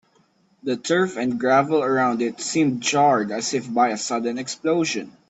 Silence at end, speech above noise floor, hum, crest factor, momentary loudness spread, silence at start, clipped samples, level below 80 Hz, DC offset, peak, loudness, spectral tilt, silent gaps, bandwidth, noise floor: 0.2 s; 40 dB; none; 16 dB; 8 LU; 0.65 s; under 0.1%; -68 dBFS; under 0.1%; -6 dBFS; -21 LUFS; -4 dB/octave; none; 8.4 kHz; -61 dBFS